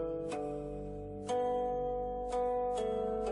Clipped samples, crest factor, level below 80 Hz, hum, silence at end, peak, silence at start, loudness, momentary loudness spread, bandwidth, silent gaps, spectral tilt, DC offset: under 0.1%; 12 dB; -52 dBFS; none; 0 s; -24 dBFS; 0 s; -36 LUFS; 9 LU; 11 kHz; none; -6 dB/octave; under 0.1%